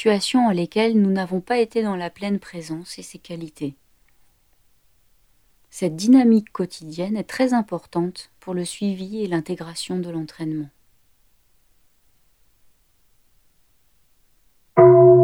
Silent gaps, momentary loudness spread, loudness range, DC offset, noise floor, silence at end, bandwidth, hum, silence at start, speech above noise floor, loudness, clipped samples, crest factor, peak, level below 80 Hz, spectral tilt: none; 18 LU; 13 LU; under 0.1%; -63 dBFS; 0 s; 12.5 kHz; none; 0 s; 41 dB; -21 LUFS; under 0.1%; 20 dB; -2 dBFS; -60 dBFS; -6.5 dB/octave